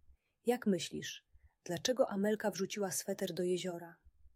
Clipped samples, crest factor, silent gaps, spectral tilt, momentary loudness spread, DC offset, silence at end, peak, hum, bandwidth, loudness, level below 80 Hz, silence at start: under 0.1%; 20 dB; none; -4 dB/octave; 13 LU; under 0.1%; 0.05 s; -18 dBFS; none; 16 kHz; -37 LUFS; -72 dBFS; 0.45 s